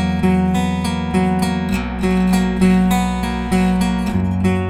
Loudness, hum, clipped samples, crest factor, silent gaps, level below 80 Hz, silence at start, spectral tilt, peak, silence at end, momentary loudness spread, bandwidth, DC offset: -17 LUFS; none; under 0.1%; 14 dB; none; -30 dBFS; 0 s; -6.5 dB/octave; -2 dBFS; 0 s; 5 LU; 15 kHz; under 0.1%